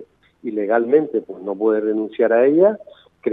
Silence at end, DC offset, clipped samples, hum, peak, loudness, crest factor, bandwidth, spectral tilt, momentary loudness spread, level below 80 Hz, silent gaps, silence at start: 0 s; under 0.1%; under 0.1%; none; -2 dBFS; -18 LUFS; 16 dB; 3.9 kHz; -10 dB/octave; 14 LU; -70 dBFS; none; 0 s